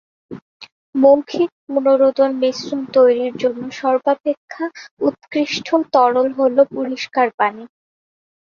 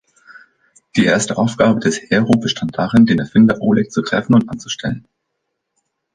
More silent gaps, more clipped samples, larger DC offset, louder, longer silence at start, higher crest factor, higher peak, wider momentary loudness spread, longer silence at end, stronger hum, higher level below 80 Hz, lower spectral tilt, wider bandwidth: first, 0.42-0.60 s, 0.72-0.93 s, 1.52-1.67 s, 4.20-4.24 s, 4.37-4.48 s, 4.91-4.97 s, 7.34-7.38 s vs none; neither; neither; about the same, -17 LUFS vs -15 LUFS; second, 0.3 s vs 0.95 s; about the same, 16 dB vs 16 dB; about the same, -2 dBFS vs -2 dBFS; about the same, 12 LU vs 10 LU; second, 0.8 s vs 1.15 s; neither; second, -64 dBFS vs -48 dBFS; about the same, -4.5 dB/octave vs -5.5 dB/octave; second, 7 kHz vs 10 kHz